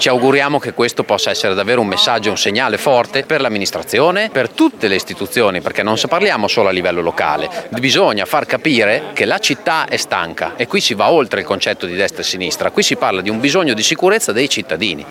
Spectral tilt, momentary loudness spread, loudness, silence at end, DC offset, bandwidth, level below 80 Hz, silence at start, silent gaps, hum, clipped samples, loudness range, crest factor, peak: -3 dB/octave; 5 LU; -14 LUFS; 0 s; under 0.1%; 17 kHz; -56 dBFS; 0 s; none; none; under 0.1%; 1 LU; 14 dB; 0 dBFS